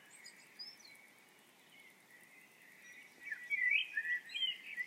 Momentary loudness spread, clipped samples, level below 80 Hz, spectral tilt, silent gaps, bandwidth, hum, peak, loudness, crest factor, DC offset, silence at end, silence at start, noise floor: 27 LU; under 0.1%; under -90 dBFS; 1.5 dB/octave; none; 16 kHz; none; -22 dBFS; -36 LUFS; 22 dB; under 0.1%; 0 s; 0 s; -65 dBFS